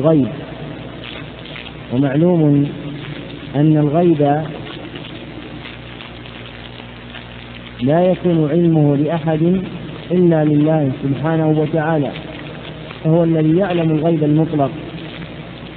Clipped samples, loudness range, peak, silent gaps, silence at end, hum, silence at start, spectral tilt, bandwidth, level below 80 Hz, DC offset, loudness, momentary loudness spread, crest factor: under 0.1%; 6 LU; -2 dBFS; none; 0 s; 60 Hz at -40 dBFS; 0 s; -12.5 dB/octave; 4.4 kHz; -44 dBFS; under 0.1%; -16 LUFS; 18 LU; 16 dB